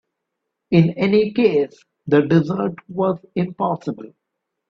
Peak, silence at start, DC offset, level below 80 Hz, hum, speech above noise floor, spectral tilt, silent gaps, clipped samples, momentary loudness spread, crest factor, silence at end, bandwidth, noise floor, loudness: -2 dBFS; 0.7 s; under 0.1%; -58 dBFS; none; 60 dB; -9 dB/octave; none; under 0.1%; 11 LU; 16 dB; 0.65 s; 6.4 kHz; -79 dBFS; -19 LUFS